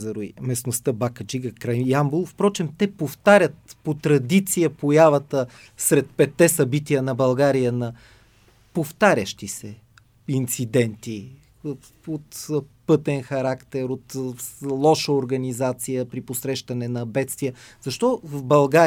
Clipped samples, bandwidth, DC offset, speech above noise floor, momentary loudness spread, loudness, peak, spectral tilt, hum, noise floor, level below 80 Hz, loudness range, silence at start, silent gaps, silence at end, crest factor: under 0.1%; 19.5 kHz; under 0.1%; 34 dB; 15 LU; -22 LUFS; -2 dBFS; -5.5 dB/octave; none; -56 dBFS; -60 dBFS; 7 LU; 0 s; none; 0 s; 20 dB